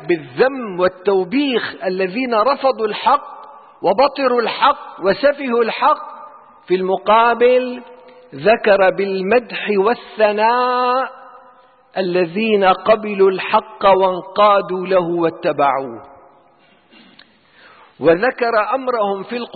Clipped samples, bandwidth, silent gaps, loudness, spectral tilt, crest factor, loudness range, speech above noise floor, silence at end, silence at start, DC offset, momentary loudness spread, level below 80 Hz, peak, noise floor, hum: under 0.1%; 4.8 kHz; none; -16 LUFS; -10.5 dB/octave; 14 dB; 5 LU; 37 dB; 0.05 s; 0 s; under 0.1%; 8 LU; -56 dBFS; -2 dBFS; -52 dBFS; none